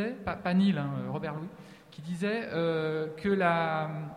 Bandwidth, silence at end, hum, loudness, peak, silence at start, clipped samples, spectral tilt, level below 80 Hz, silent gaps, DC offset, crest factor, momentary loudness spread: 10.5 kHz; 0 s; none; -30 LUFS; -12 dBFS; 0 s; under 0.1%; -7.5 dB/octave; -62 dBFS; none; under 0.1%; 18 dB; 15 LU